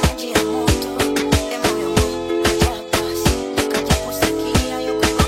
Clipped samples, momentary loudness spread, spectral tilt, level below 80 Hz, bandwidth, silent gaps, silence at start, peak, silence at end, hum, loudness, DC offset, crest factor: under 0.1%; 3 LU; -4.5 dB/octave; -28 dBFS; 16.5 kHz; none; 0 s; 0 dBFS; 0 s; none; -19 LUFS; under 0.1%; 18 dB